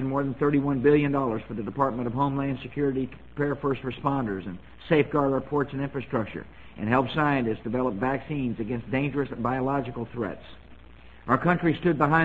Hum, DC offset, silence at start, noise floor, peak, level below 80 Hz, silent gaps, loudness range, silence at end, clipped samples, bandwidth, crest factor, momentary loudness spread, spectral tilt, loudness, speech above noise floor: none; 0.3%; 0 s; -50 dBFS; -6 dBFS; -50 dBFS; none; 3 LU; 0 s; under 0.1%; 7.6 kHz; 20 dB; 11 LU; -9.5 dB/octave; -27 LUFS; 24 dB